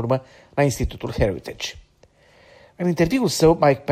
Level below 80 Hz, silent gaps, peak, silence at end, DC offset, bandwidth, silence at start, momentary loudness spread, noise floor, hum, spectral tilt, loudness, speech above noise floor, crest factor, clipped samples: -38 dBFS; none; -4 dBFS; 0 s; under 0.1%; 15.5 kHz; 0 s; 14 LU; -56 dBFS; none; -5.5 dB/octave; -21 LUFS; 35 dB; 18 dB; under 0.1%